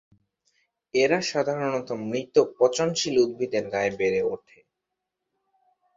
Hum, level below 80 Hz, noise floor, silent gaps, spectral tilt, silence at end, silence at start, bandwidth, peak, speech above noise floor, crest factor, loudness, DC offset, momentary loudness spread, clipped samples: none; -66 dBFS; -84 dBFS; none; -4 dB/octave; 1.6 s; 0.95 s; 7.8 kHz; -6 dBFS; 59 dB; 20 dB; -25 LUFS; under 0.1%; 8 LU; under 0.1%